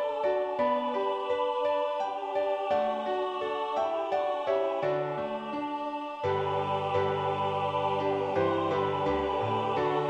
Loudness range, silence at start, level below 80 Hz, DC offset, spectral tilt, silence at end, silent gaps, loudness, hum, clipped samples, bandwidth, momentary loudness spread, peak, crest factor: 2 LU; 0 s; -60 dBFS; under 0.1%; -7 dB/octave; 0 s; none; -30 LUFS; none; under 0.1%; 9 kHz; 4 LU; -16 dBFS; 14 dB